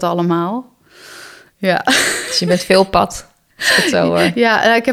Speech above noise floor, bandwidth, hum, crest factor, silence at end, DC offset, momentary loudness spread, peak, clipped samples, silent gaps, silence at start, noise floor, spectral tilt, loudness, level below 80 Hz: 25 dB; 16.5 kHz; none; 16 dB; 0 s; under 0.1%; 11 LU; 0 dBFS; under 0.1%; none; 0 s; -39 dBFS; -3.5 dB/octave; -14 LUFS; -44 dBFS